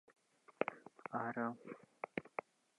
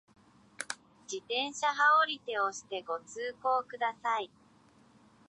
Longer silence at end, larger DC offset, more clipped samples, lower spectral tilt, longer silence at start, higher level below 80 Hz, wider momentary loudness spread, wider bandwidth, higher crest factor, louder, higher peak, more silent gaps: second, 0.6 s vs 1.05 s; neither; neither; first, -7 dB/octave vs -0.5 dB/octave; about the same, 0.6 s vs 0.6 s; second, -88 dBFS vs -80 dBFS; second, 12 LU vs 18 LU; about the same, 10.5 kHz vs 11 kHz; first, 28 dB vs 20 dB; second, -45 LUFS vs -32 LUFS; second, -18 dBFS vs -14 dBFS; neither